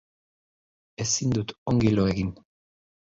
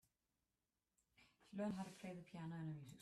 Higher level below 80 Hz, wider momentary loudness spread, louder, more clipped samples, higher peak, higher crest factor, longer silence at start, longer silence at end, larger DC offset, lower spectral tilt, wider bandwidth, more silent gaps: first, -48 dBFS vs -82 dBFS; about the same, 9 LU vs 8 LU; first, -25 LUFS vs -51 LUFS; neither; first, -10 dBFS vs -36 dBFS; about the same, 18 dB vs 18 dB; second, 1 s vs 1.2 s; first, 0.8 s vs 0 s; neither; second, -5 dB/octave vs -7 dB/octave; second, 7.8 kHz vs 13.5 kHz; first, 1.58-1.66 s vs none